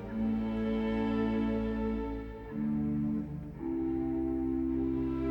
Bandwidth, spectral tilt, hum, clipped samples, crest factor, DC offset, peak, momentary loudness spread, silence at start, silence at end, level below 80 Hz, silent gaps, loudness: 5.6 kHz; -9.5 dB/octave; none; under 0.1%; 12 dB; under 0.1%; -20 dBFS; 6 LU; 0 s; 0 s; -46 dBFS; none; -33 LUFS